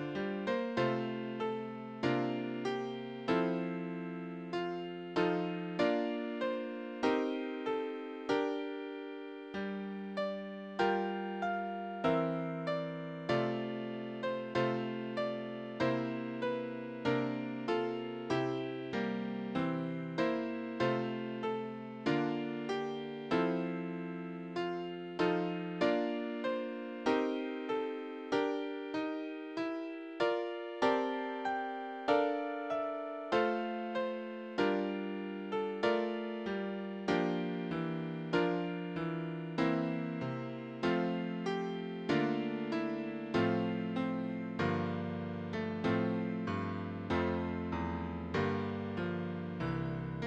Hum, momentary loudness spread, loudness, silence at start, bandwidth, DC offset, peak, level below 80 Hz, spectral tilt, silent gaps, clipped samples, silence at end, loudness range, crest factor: none; 8 LU; -36 LUFS; 0 s; 8.8 kHz; under 0.1%; -16 dBFS; -68 dBFS; -7 dB/octave; none; under 0.1%; 0 s; 2 LU; 20 dB